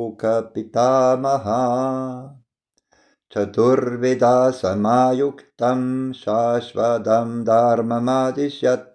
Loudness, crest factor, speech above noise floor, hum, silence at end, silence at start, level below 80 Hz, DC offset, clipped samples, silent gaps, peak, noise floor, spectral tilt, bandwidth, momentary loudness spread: -19 LUFS; 14 dB; 52 dB; none; 0.1 s; 0 s; -66 dBFS; under 0.1%; under 0.1%; none; -6 dBFS; -71 dBFS; -6.5 dB/octave; 9.6 kHz; 8 LU